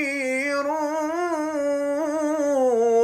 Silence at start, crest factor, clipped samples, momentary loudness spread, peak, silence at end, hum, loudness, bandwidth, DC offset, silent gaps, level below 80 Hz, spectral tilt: 0 s; 12 dB; under 0.1%; 5 LU; -12 dBFS; 0 s; none; -23 LUFS; 15.5 kHz; under 0.1%; none; -68 dBFS; -3 dB/octave